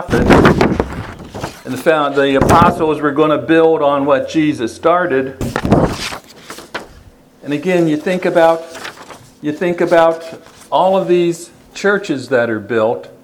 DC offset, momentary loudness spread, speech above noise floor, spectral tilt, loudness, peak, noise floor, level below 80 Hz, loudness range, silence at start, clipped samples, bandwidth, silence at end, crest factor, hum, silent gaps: under 0.1%; 18 LU; 30 dB; -6 dB/octave; -14 LUFS; 0 dBFS; -42 dBFS; -34 dBFS; 5 LU; 0 s; 0.1%; 19 kHz; 0.15 s; 14 dB; none; none